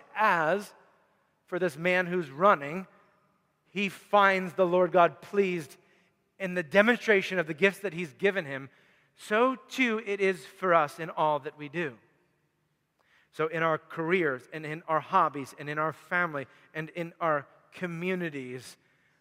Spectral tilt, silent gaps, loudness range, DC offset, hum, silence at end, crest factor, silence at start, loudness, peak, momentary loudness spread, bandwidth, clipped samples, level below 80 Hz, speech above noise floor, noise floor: -5.5 dB/octave; none; 6 LU; under 0.1%; none; 0.5 s; 24 dB; 0.15 s; -28 LUFS; -6 dBFS; 15 LU; 16 kHz; under 0.1%; -82 dBFS; 47 dB; -76 dBFS